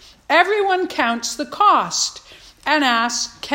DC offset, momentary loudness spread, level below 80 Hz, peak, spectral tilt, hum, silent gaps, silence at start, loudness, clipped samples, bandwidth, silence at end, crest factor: under 0.1%; 8 LU; -58 dBFS; 0 dBFS; -1 dB/octave; none; none; 0.3 s; -18 LUFS; under 0.1%; 16.5 kHz; 0 s; 18 dB